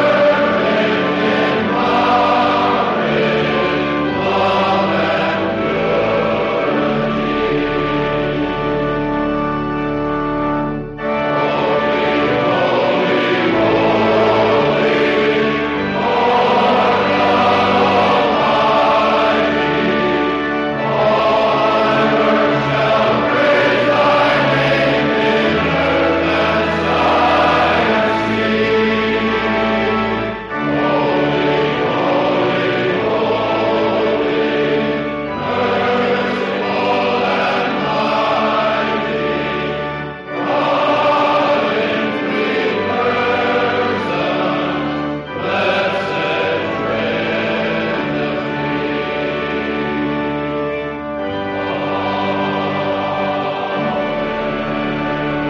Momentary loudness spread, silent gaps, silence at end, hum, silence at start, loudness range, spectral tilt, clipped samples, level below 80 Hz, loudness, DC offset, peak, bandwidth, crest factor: 7 LU; none; 0 s; none; 0 s; 5 LU; -6.5 dB/octave; under 0.1%; -42 dBFS; -16 LUFS; under 0.1%; -4 dBFS; 7.6 kHz; 12 dB